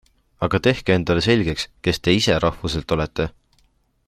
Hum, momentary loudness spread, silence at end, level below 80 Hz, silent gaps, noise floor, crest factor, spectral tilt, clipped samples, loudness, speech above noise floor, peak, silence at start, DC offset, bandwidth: none; 9 LU; 0.8 s; -40 dBFS; none; -62 dBFS; 20 dB; -5.5 dB/octave; under 0.1%; -20 LUFS; 42 dB; -2 dBFS; 0.4 s; under 0.1%; 14.5 kHz